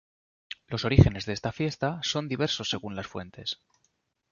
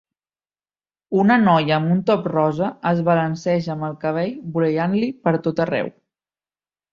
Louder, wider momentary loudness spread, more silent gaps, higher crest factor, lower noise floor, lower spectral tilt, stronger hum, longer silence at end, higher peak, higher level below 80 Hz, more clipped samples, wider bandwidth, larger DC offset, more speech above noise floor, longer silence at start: second, -28 LUFS vs -20 LUFS; first, 17 LU vs 9 LU; neither; first, 26 dB vs 18 dB; second, -74 dBFS vs under -90 dBFS; second, -5.5 dB/octave vs -8 dB/octave; second, none vs 50 Hz at -50 dBFS; second, 0.8 s vs 1.05 s; about the same, -4 dBFS vs -2 dBFS; first, -42 dBFS vs -60 dBFS; neither; about the same, 7.4 kHz vs 7.2 kHz; neither; second, 47 dB vs over 71 dB; second, 0.7 s vs 1.1 s